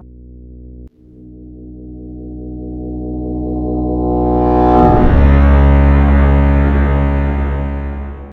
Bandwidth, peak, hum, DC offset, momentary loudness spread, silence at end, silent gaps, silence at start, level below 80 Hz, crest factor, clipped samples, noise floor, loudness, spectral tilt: 4.1 kHz; 0 dBFS; none; under 0.1%; 20 LU; 0 s; none; 0.2 s; -16 dBFS; 12 dB; under 0.1%; -38 dBFS; -13 LUFS; -10.5 dB/octave